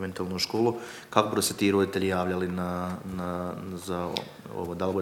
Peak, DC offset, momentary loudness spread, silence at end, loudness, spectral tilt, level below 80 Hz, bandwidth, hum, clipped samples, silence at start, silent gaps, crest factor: -4 dBFS; under 0.1%; 11 LU; 0 s; -29 LUFS; -4.5 dB/octave; -60 dBFS; 18 kHz; none; under 0.1%; 0 s; none; 26 dB